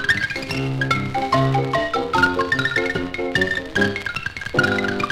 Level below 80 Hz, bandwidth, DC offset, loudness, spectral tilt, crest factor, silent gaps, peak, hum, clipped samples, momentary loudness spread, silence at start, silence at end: -44 dBFS; 15 kHz; under 0.1%; -20 LUFS; -5.5 dB/octave; 18 dB; none; -2 dBFS; none; under 0.1%; 6 LU; 0 s; 0 s